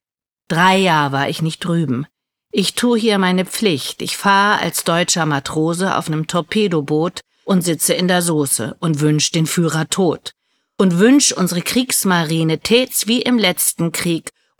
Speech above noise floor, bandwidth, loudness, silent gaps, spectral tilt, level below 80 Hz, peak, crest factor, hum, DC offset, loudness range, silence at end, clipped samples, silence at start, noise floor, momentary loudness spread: 61 dB; 20 kHz; -16 LUFS; none; -4 dB/octave; -58 dBFS; -2 dBFS; 16 dB; none; under 0.1%; 3 LU; 0.3 s; under 0.1%; 0.5 s; -77 dBFS; 8 LU